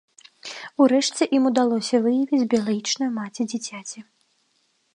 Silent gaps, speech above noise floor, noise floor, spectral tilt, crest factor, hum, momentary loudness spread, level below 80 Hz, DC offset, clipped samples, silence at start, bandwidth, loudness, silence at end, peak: none; 46 dB; -68 dBFS; -4 dB/octave; 18 dB; none; 17 LU; -74 dBFS; under 0.1%; under 0.1%; 0.45 s; 11 kHz; -22 LUFS; 0.9 s; -6 dBFS